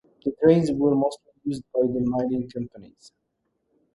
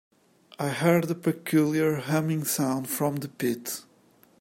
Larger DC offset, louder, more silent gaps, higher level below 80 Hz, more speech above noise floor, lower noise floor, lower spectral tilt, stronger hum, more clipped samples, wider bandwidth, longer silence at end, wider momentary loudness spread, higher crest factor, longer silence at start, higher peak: neither; about the same, -24 LUFS vs -26 LUFS; neither; first, -56 dBFS vs -70 dBFS; first, 52 dB vs 34 dB; first, -75 dBFS vs -60 dBFS; first, -8 dB/octave vs -5.5 dB/octave; neither; neither; second, 11.5 kHz vs 16.5 kHz; first, 1.1 s vs 0.6 s; first, 15 LU vs 9 LU; about the same, 20 dB vs 20 dB; second, 0.25 s vs 0.6 s; about the same, -6 dBFS vs -8 dBFS